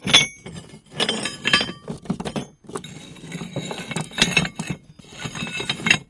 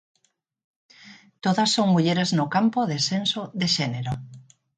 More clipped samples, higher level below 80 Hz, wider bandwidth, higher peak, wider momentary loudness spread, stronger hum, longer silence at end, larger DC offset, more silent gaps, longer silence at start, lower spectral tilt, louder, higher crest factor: neither; first, -50 dBFS vs -60 dBFS; first, 11.5 kHz vs 9.4 kHz; first, 0 dBFS vs -10 dBFS; first, 20 LU vs 9 LU; neither; second, 0.05 s vs 0.35 s; neither; neither; second, 0 s vs 1.05 s; second, -2.5 dB/octave vs -4.5 dB/octave; about the same, -22 LUFS vs -23 LUFS; first, 24 dB vs 16 dB